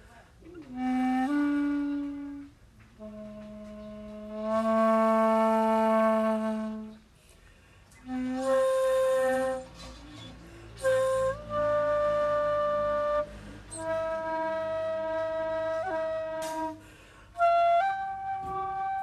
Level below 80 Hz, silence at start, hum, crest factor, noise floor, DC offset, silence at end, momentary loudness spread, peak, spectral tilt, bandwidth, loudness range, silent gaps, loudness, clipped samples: -56 dBFS; 0.05 s; none; 14 dB; -57 dBFS; under 0.1%; 0 s; 20 LU; -16 dBFS; -5.5 dB/octave; 13.5 kHz; 6 LU; none; -28 LUFS; under 0.1%